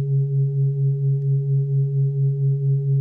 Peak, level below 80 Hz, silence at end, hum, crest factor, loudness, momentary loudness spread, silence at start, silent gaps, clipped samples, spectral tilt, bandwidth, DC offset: -14 dBFS; -74 dBFS; 0 s; none; 6 dB; -21 LUFS; 1 LU; 0 s; none; under 0.1%; -14.5 dB/octave; 0.5 kHz; under 0.1%